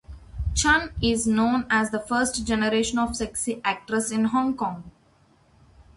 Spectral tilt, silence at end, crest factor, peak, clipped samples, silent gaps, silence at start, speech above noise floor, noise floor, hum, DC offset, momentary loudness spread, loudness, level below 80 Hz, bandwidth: -3.5 dB/octave; 0.15 s; 18 dB; -6 dBFS; under 0.1%; none; 0.1 s; 36 dB; -60 dBFS; none; under 0.1%; 7 LU; -24 LUFS; -40 dBFS; 11.5 kHz